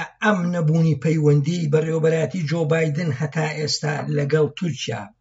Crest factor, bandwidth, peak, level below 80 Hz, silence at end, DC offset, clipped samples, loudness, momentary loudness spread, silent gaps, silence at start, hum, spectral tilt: 14 dB; 8 kHz; -6 dBFS; -62 dBFS; 0.15 s; under 0.1%; under 0.1%; -21 LUFS; 5 LU; none; 0 s; none; -6 dB/octave